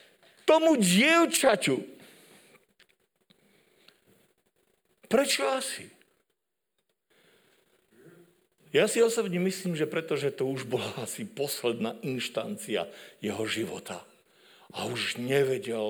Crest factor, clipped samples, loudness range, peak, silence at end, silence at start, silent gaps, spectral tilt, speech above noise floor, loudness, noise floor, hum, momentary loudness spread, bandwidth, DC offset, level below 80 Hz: 22 dB; under 0.1%; 8 LU; -8 dBFS; 0 s; 0.45 s; none; -4 dB/octave; 54 dB; -27 LUFS; -82 dBFS; none; 15 LU; over 20 kHz; under 0.1%; -76 dBFS